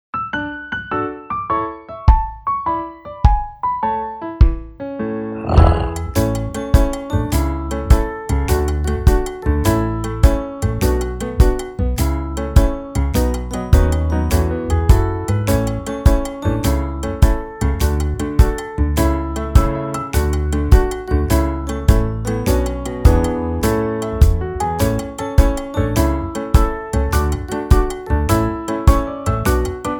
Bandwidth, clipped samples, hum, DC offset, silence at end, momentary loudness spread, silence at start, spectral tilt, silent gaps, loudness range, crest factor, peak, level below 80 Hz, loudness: over 20 kHz; 0.1%; none; under 0.1%; 0 s; 7 LU; 0.15 s; -6.5 dB/octave; none; 2 LU; 16 dB; 0 dBFS; -18 dBFS; -18 LUFS